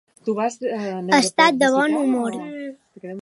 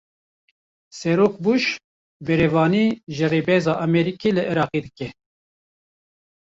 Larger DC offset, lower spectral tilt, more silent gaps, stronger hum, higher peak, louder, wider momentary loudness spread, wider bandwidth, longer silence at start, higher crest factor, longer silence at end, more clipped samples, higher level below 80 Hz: neither; second, -3.5 dB/octave vs -6.5 dB/octave; second, none vs 1.84-2.20 s; neither; about the same, -2 dBFS vs -4 dBFS; about the same, -19 LUFS vs -20 LUFS; first, 19 LU vs 14 LU; first, 11.5 kHz vs 7.8 kHz; second, 0.25 s vs 0.95 s; about the same, 20 dB vs 18 dB; second, 0.05 s vs 1.4 s; neither; second, -72 dBFS vs -54 dBFS